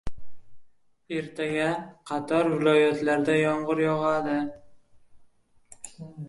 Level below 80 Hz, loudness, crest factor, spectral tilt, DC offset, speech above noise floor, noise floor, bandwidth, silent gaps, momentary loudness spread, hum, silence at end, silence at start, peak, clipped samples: -54 dBFS; -25 LUFS; 18 dB; -6 dB/octave; under 0.1%; 32 dB; -58 dBFS; 11.5 kHz; none; 20 LU; none; 0 s; 0.05 s; -10 dBFS; under 0.1%